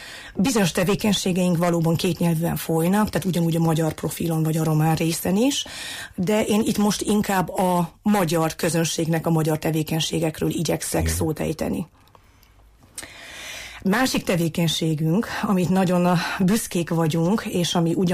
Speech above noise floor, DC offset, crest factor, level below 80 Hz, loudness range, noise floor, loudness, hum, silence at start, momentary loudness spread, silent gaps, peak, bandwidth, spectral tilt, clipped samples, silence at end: 31 dB; under 0.1%; 12 dB; -46 dBFS; 5 LU; -53 dBFS; -22 LUFS; none; 0 s; 7 LU; none; -10 dBFS; 15.5 kHz; -5.5 dB/octave; under 0.1%; 0 s